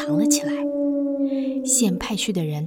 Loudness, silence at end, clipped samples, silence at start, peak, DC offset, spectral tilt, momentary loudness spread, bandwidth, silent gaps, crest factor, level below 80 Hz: -22 LUFS; 0 s; under 0.1%; 0 s; -6 dBFS; under 0.1%; -4 dB/octave; 5 LU; 18.5 kHz; none; 16 dB; -52 dBFS